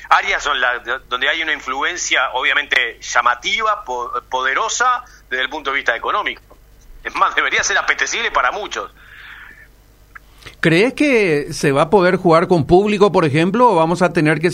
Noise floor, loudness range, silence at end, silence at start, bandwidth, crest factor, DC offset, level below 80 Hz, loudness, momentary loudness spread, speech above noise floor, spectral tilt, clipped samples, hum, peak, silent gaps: -47 dBFS; 6 LU; 0 s; 0 s; 15.5 kHz; 16 dB; under 0.1%; -44 dBFS; -16 LUFS; 10 LU; 31 dB; -4 dB/octave; under 0.1%; 50 Hz at -50 dBFS; 0 dBFS; none